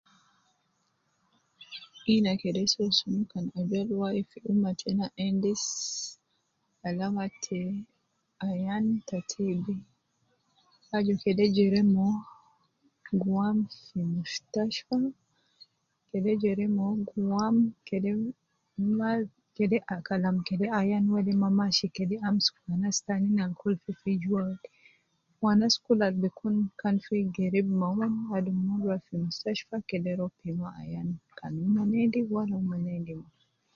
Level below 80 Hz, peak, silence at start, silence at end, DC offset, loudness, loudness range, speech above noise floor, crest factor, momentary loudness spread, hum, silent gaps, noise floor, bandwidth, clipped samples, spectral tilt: -66 dBFS; -12 dBFS; 1.6 s; 0.55 s; under 0.1%; -29 LUFS; 5 LU; 47 dB; 18 dB; 10 LU; none; none; -75 dBFS; 7.6 kHz; under 0.1%; -5.5 dB/octave